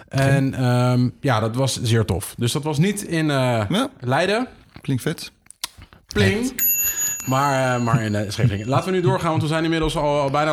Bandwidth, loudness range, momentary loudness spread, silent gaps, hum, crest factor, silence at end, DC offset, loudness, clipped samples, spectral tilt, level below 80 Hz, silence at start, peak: 19 kHz; 3 LU; 8 LU; none; none; 18 dB; 0 s; under 0.1%; -20 LUFS; under 0.1%; -5 dB/octave; -44 dBFS; 0 s; -4 dBFS